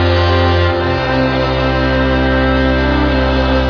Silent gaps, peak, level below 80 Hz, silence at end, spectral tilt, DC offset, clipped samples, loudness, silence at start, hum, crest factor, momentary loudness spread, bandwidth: none; -2 dBFS; -20 dBFS; 0 s; -7.5 dB/octave; under 0.1%; under 0.1%; -13 LUFS; 0 s; none; 12 dB; 2 LU; 5.4 kHz